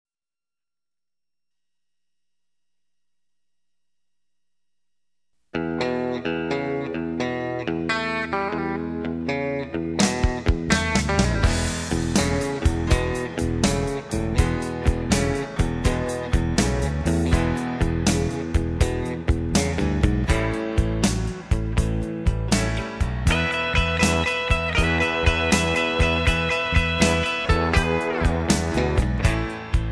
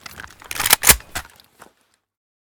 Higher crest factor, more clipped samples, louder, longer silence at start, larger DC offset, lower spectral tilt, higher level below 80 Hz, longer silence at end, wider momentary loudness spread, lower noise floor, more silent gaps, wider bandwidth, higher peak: about the same, 18 dB vs 22 dB; second, under 0.1% vs 0.1%; second, -23 LUFS vs -14 LUFS; first, 5.55 s vs 0.15 s; neither; first, -5 dB/octave vs 0 dB/octave; first, -30 dBFS vs -38 dBFS; second, 0 s vs 1.35 s; second, 7 LU vs 25 LU; first, under -90 dBFS vs -62 dBFS; neither; second, 11 kHz vs over 20 kHz; second, -4 dBFS vs 0 dBFS